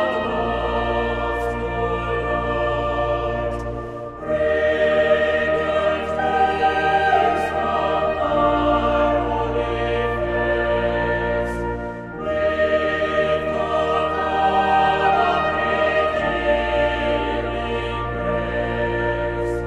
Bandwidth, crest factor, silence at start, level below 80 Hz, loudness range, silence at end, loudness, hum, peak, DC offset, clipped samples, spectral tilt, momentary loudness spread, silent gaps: 10.5 kHz; 16 dB; 0 s; -34 dBFS; 4 LU; 0 s; -20 LUFS; none; -4 dBFS; under 0.1%; under 0.1%; -6.5 dB/octave; 7 LU; none